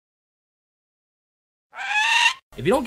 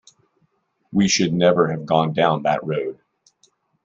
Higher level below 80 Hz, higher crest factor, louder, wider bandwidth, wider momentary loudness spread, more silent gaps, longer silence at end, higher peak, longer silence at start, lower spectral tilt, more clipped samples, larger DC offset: first, -54 dBFS vs -60 dBFS; about the same, 18 dB vs 20 dB; about the same, -19 LUFS vs -19 LUFS; first, 16 kHz vs 7.8 kHz; about the same, 11 LU vs 9 LU; first, 2.42-2.51 s vs none; second, 0 s vs 0.9 s; second, -6 dBFS vs -2 dBFS; first, 1.75 s vs 0.9 s; second, -2.5 dB/octave vs -5 dB/octave; neither; neither